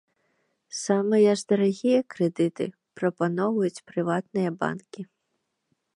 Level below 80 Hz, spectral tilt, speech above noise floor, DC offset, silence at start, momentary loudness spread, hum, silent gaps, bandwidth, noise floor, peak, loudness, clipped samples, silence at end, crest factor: -76 dBFS; -6 dB/octave; 53 dB; under 0.1%; 0.7 s; 14 LU; none; none; 11 kHz; -78 dBFS; -8 dBFS; -25 LUFS; under 0.1%; 0.9 s; 18 dB